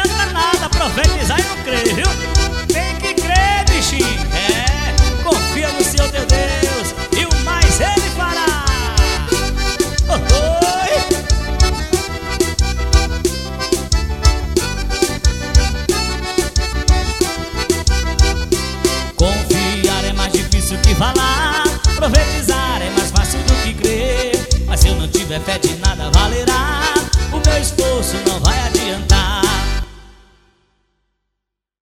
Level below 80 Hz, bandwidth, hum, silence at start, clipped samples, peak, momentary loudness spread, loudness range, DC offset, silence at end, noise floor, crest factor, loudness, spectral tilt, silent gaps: -18 dBFS; 16.5 kHz; none; 0 s; under 0.1%; 0 dBFS; 5 LU; 2 LU; under 0.1%; 1.7 s; -79 dBFS; 16 dB; -16 LUFS; -4 dB/octave; none